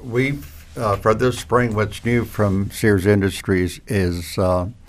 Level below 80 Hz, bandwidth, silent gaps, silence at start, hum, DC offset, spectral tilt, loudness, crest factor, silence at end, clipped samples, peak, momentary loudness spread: -40 dBFS; 16 kHz; none; 0 s; none; under 0.1%; -6.5 dB/octave; -20 LUFS; 16 dB; 0.15 s; under 0.1%; -4 dBFS; 5 LU